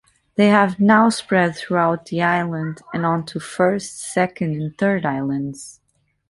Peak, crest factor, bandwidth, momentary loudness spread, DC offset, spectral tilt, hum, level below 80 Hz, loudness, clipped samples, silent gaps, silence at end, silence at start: -2 dBFS; 18 dB; 11.5 kHz; 12 LU; under 0.1%; -6 dB/octave; none; -58 dBFS; -19 LUFS; under 0.1%; none; 0.6 s; 0.4 s